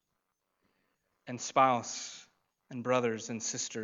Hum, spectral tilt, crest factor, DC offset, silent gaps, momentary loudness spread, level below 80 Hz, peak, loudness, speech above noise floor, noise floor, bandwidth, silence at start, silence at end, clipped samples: none; -3.5 dB/octave; 22 dB; under 0.1%; none; 18 LU; -86 dBFS; -12 dBFS; -32 LUFS; 51 dB; -83 dBFS; 8 kHz; 1.25 s; 0 s; under 0.1%